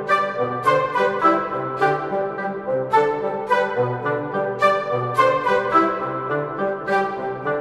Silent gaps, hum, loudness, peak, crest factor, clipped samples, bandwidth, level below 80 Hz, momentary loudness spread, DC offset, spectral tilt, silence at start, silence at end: none; none; -21 LUFS; -4 dBFS; 16 dB; under 0.1%; 13 kHz; -58 dBFS; 7 LU; under 0.1%; -6 dB/octave; 0 s; 0 s